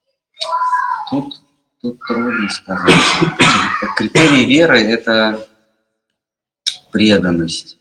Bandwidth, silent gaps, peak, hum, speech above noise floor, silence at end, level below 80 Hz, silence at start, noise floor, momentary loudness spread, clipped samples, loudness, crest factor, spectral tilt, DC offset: 12.5 kHz; none; 0 dBFS; none; 71 dB; 0.1 s; -48 dBFS; 0.4 s; -84 dBFS; 13 LU; under 0.1%; -13 LUFS; 14 dB; -4 dB/octave; under 0.1%